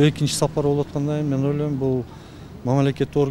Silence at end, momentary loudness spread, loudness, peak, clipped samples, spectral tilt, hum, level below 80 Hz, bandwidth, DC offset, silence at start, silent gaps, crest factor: 0 s; 11 LU; -22 LUFS; -4 dBFS; under 0.1%; -6.5 dB/octave; none; -46 dBFS; 14 kHz; under 0.1%; 0 s; none; 18 dB